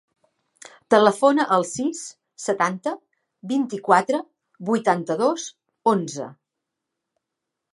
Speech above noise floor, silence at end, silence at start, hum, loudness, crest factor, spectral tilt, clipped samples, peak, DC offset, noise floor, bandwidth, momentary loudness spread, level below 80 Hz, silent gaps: 62 dB; 1.4 s; 0.9 s; none; -22 LUFS; 22 dB; -4.5 dB/octave; under 0.1%; 0 dBFS; under 0.1%; -83 dBFS; 11.5 kHz; 17 LU; -74 dBFS; none